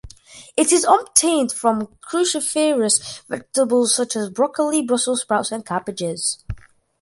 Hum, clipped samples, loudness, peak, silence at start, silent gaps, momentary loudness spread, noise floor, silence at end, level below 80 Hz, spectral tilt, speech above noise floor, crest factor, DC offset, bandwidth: none; under 0.1%; -19 LUFS; 0 dBFS; 0.05 s; none; 11 LU; -44 dBFS; 0.45 s; -48 dBFS; -2.5 dB/octave; 24 dB; 20 dB; under 0.1%; 12 kHz